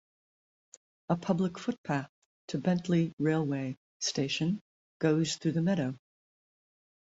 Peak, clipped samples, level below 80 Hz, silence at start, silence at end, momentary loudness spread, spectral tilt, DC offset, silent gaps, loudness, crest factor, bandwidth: -12 dBFS; under 0.1%; -70 dBFS; 1.1 s; 1.2 s; 9 LU; -5.5 dB/octave; under 0.1%; 1.78-1.84 s, 2.09-2.48 s, 3.13-3.18 s, 3.77-4.00 s, 4.61-5.00 s; -31 LUFS; 20 dB; 8 kHz